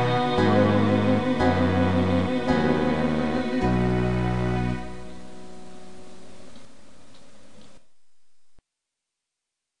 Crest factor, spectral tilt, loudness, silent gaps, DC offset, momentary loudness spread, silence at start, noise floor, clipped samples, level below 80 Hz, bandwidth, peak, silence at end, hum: 16 dB; -7.5 dB/octave; -23 LUFS; none; 2%; 22 LU; 0 s; -84 dBFS; under 0.1%; -42 dBFS; 10.5 kHz; -8 dBFS; 0 s; none